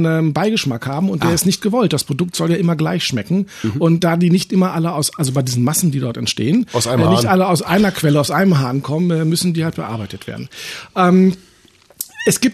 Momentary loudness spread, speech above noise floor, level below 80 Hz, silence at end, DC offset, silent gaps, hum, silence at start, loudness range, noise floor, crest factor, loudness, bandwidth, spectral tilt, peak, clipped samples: 10 LU; 34 dB; -52 dBFS; 0 s; under 0.1%; none; none; 0 s; 3 LU; -50 dBFS; 14 dB; -16 LUFS; 14 kHz; -5.5 dB/octave; -2 dBFS; under 0.1%